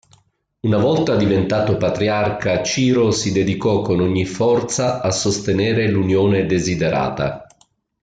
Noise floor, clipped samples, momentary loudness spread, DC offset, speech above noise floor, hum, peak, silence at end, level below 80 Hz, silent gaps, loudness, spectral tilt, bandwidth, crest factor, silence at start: -58 dBFS; under 0.1%; 4 LU; under 0.1%; 41 dB; none; -6 dBFS; 0.6 s; -48 dBFS; none; -18 LUFS; -5.5 dB/octave; 9.4 kHz; 12 dB; 0.65 s